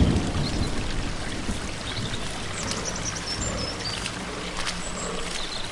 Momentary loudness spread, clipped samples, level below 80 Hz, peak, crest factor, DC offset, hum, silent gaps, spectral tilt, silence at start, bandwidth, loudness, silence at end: 4 LU; under 0.1%; -36 dBFS; -10 dBFS; 18 dB; under 0.1%; none; none; -3.5 dB/octave; 0 s; 11.5 kHz; -29 LUFS; 0 s